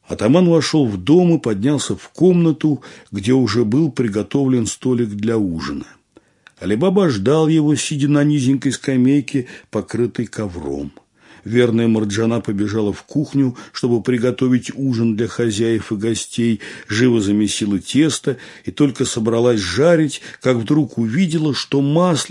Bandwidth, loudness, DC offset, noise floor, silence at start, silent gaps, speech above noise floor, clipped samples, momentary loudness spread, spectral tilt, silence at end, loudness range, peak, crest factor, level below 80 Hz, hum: 11.5 kHz; -17 LUFS; under 0.1%; -50 dBFS; 0.1 s; none; 34 dB; under 0.1%; 10 LU; -6 dB/octave; 0 s; 3 LU; 0 dBFS; 16 dB; -54 dBFS; none